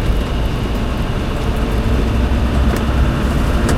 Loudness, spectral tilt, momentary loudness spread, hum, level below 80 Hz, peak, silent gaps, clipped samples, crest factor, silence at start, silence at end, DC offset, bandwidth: -18 LUFS; -6.5 dB/octave; 4 LU; none; -18 dBFS; -2 dBFS; none; under 0.1%; 12 dB; 0 s; 0 s; under 0.1%; 15 kHz